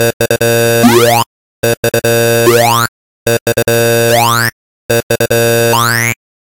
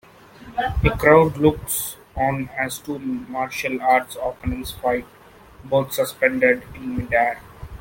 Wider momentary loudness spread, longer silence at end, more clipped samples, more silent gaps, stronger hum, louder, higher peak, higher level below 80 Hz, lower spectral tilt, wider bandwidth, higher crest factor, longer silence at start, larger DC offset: second, 7 LU vs 13 LU; first, 0.4 s vs 0.05 s; neither; first, 0.13-0.20 s, 1.26-1.63 s, 1.77-1.83 s, 2.88-3.26 s, 3.41-3.46 s, 4.52-4.89 s, 5.03-5.09 s vs none; neither; first, -10 LUFS vs -21 LUFS; about the same, 0 dBFS vs -2 dBFS; second, -44 dBFS vs -38 dBFS; about the same, -4 dB/octave vs -5 dB/octave; about the same, 17.5 kHz vs 17 kHz; second, 10 dB vs 20 dB; second, 0 s vs 0.4 s; first, 1% vs under 0.1%